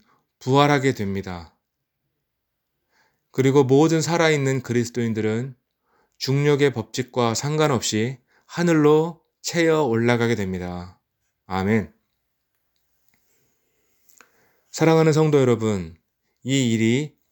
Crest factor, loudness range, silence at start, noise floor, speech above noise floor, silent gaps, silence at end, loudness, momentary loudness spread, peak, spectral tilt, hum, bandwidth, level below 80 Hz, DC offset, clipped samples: 22 dB; 9 LU; 0.4 s; -78 dBFS; 58 dB; none; 0.25 s; -21 LUFS; 15 LU; -2 dBFS; -5.5 dB/octave; none; 20 kHz; -64 dBFS; under 0.1%; under 0.1%